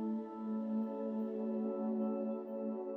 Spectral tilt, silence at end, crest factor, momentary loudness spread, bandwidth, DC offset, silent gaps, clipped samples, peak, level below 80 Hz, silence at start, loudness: -11 dB/octave; 0 s; 12 dB; 4 LU; 3.4 kHz; under 0.1%; none; under 0.1%; -28 dBFS; -84 dBFS; 0 s; -39 LUFS